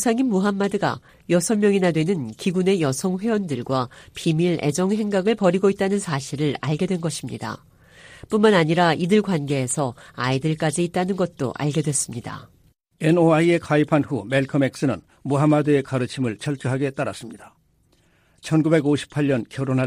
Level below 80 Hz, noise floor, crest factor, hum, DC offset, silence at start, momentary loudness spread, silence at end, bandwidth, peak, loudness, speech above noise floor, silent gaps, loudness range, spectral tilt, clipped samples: -58 dBFS; -61 dBFS; 18 dB; none; under 0.1%; 0 s; 10 LU; 0 s; 15.5 kHz; -4 dBFS; -22 LUFS; 40 dB; none; 3 LU; -5.5 dB/octave; under 0.1%